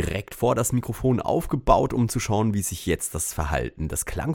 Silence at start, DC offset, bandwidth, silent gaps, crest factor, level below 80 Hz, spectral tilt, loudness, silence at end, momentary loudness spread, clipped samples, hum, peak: 0 s; under 0.1%; 18.5 kHz; none; 20 dB; -36 dBFS; -5.5 dB/octave; -24 LUFS; 0 s; 7 LU; under 0.1%; none; -4 dBFS